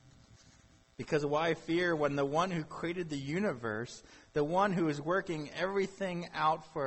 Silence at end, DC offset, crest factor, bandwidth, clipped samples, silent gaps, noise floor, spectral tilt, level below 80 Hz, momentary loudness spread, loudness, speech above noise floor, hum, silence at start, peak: 0 s; under 0.1%; 16 dB; 8.4 kHz; under 0.1%; none; -63 dBFS; -6 dB/octave; -64 dBFS; 8 LU; -34 LUFS; 29 dB; none; 0.35 s; -18 dBFS